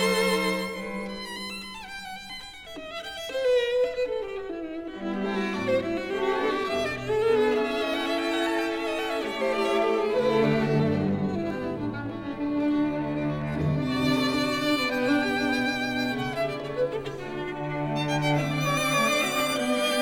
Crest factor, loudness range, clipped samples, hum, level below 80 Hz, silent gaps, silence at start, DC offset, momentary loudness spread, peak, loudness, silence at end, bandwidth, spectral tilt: 14 dB; 4 LU; under 0.1%; none; -54 dBFS; none; 0 s; 0.1%; 11 LU; -12 dBFS; -27 LUFS; 0 s; 19 kHz; -5 dB/octave